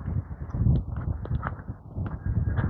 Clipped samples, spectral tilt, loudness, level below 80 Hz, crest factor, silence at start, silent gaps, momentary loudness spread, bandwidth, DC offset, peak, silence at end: under 0.1%; -11.5 dB/octave; -30 LUFS; -34 dBFS; 16 dB; 0 s; none; 10 LU; 4.1 kHz; under 0.1%; -12 dBFS; 0 s